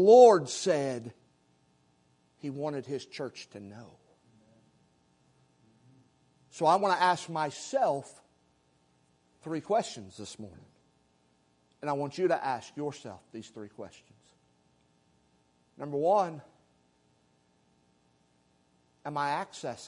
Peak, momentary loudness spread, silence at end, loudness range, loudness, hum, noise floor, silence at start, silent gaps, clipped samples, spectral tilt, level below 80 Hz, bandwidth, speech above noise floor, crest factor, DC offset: -6 dBFS; 21 LU; 0 s; 11 LU; -29 LUFS; none; -69 dBFS; 0 s; none; under 0.1%; -5 dB/octave; -80 dBFS; 11 kHz; 41 dB; 24 dB; under 0.1%